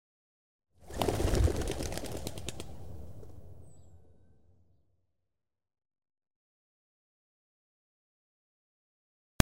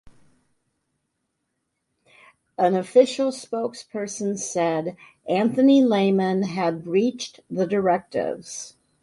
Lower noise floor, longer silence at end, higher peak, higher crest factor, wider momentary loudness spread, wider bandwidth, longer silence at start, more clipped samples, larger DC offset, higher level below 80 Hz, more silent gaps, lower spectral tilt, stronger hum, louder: first, -88 dBFS vs -77 dBFS; first, 3.15 s vs 0.35 s; first, 0 dBFS vs -4 dBFS; first, 38 dB vs 20 dB; first, 24 LU vs 16 LU; first, 16 kHz vs 11.5 kHz; first, 0.6 s vs 0.05 s; neither; neither; first, -44 dBFS vs -68 dBFS; neither; about the same, -5 dB/octave vs -5.5 dB/octave; neither; second, -35 LUFS vs -22 LUFS